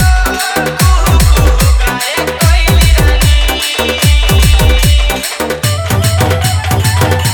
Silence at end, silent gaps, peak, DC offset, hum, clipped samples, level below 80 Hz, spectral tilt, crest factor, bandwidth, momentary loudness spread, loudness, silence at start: 0 s; none; 0 dBFS; under 0.1%; none; 0.3%; -12 dBFS; -4 dB/octave; 8 dB; over 20 kHz; 5 LU; -10 LUFS; 0 s